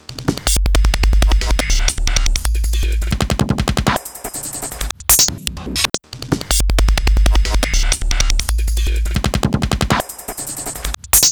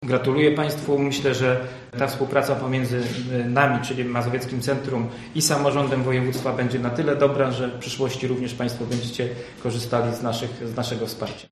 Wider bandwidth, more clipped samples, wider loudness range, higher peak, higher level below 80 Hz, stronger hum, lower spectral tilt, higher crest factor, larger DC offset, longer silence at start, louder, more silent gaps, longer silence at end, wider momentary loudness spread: first, over 20 kHz vs 13.5 kHz; neither; about the same, 3 LU vs 4 LU; about the same, 0 dBFS vs -2 dBFS; first, -18 dBFS vs -54 dBFS; neither; second, -3 dB/octave vs -5 dB/octave; second, 16 dB vs 22 dB; neither; about the same, 0.1 s vs 0 s; first, -17 LUFS vs -24 LUFS; neither; about the same, 0 s vs 0.05 s; about the same, 10 LU vs 8 LU